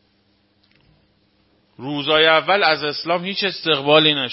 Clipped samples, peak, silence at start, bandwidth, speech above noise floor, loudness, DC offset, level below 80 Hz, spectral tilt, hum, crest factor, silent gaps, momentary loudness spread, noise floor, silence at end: under 0.1%; 0 dBFS; 1.8 s; 5.8 kHz; 44 dB; -17 LUFS; under 0.1%; -64 dBFS; -8 dB/octave; none; 20 dB; none; 10 LU; -62 dBFS; 0 s